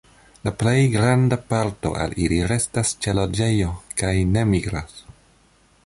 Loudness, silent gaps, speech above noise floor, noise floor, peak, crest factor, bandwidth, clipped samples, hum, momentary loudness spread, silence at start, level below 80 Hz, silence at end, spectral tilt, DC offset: -21 LUFS; none; 37 dB; -57 dBFS; -6 dBFS; 16 dB; 11.5 kHz; under 0.1%; none; 9 LU; 0.45 s; -36 dBFS; 0.75 s; -5.5 dB/octave; under 0.1%